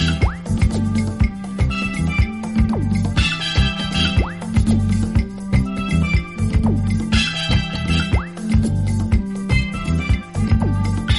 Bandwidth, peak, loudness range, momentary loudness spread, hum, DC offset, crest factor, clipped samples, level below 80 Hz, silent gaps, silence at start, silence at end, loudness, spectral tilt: 11.5 kHz; -4 dBFS; 1 LU; 3 LU; none; under 0.1%; 14 dB; under 0.1%; -24 dBFS; none; 0 s; 0 s; -19 LUFS; -6 dB/octave